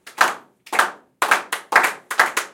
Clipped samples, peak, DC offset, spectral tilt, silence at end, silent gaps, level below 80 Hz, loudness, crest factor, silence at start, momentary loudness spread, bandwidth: under 0.1%; 0 dBFS; under 0.1%; 0 dB/octave; 0.05 s; none; -76 dBFS; -19 LUFS; 20 dB; 0.05 s; 7 LU; 17 kHz